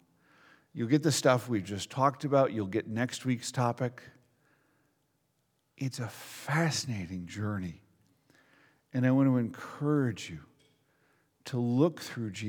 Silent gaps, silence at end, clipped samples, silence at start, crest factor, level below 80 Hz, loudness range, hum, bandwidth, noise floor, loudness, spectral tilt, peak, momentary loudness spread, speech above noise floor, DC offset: none; 0 s; under 0.1%; 0.75 s; 22 dB; -70 dBFS; 7 LU; none; 18.5 kHz; -76 dBFS; -31 LUFS; -5.5 dB/octave; -10 dBFS; 13 LU; 46 dB; under 0.1%